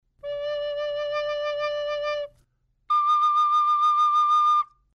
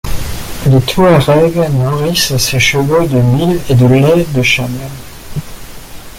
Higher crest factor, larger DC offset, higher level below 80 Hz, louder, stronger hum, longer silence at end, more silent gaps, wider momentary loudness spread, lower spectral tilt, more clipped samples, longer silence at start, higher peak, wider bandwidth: about the same, 8 dB vs 12 dB; neither; second, -62 dBFS vs -28 dBFS; second, -23 LUFS vs -10 LUFS; neither; first, 0.3 s vs 0 s; neither; second, 11 LU vs 17 LU; second, -0.5 dB/octave vs -5.5 dB/octave; neither; first, 0.25 s vs 0.05 s; second, -16 dBFS vs 0 dBFS; second, 9 kHz vs 16.5 kHz